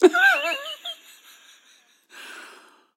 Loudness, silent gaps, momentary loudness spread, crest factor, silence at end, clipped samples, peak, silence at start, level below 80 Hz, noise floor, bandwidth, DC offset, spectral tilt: -21 LUFS; none; 25 LU; 22 dB; 0.55 s; under 0.1%; -2 dBFS; 0 s; -80 dBFS; -58 dBFS; 14 kHz; under 0.1%; -0.5 dB/octave